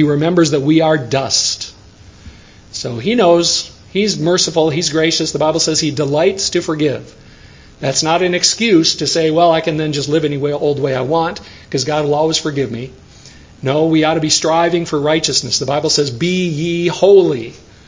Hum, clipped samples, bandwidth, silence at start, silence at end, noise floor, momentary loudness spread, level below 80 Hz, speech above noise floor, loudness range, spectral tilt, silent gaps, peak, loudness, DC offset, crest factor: none; under 0.1%; 7.8 kHz; 0 s; 0.3 s; -41 dBFS; 10 LU; -46 dBFS; 26 dB; 3 LU; -4 dB/octave; none; 0 dBFS; -14 LUFS; under 0.1%; 14 dB